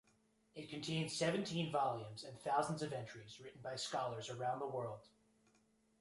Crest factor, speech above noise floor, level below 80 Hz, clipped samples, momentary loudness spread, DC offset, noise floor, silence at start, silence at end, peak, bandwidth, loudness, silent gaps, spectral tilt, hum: 20 dB; 34 dB; -78 dBFS; under 0.1%; 15 LU; under 0.1%; -76 dBFS; 0.55 s; 0.95 s; -22 dBFS; 11.5 kHz; -42 LUFS; none; -4.5 dB/octave; none